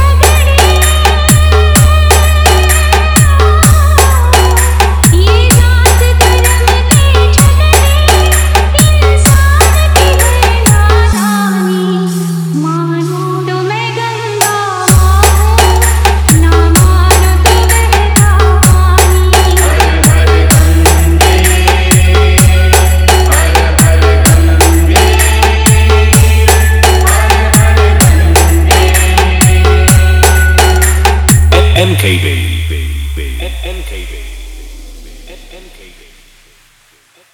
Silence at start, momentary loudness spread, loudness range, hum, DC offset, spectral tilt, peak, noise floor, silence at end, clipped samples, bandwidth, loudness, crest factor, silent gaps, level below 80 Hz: 0 s; 8 LU; 5 LU; none; under 0.1%; -4.5 dB/octave; 0 dBFS; -47 dBFS; 1.75 s; 2%; over 20 kHz; -7 LUFS; 6 dB; none; -12 dBFS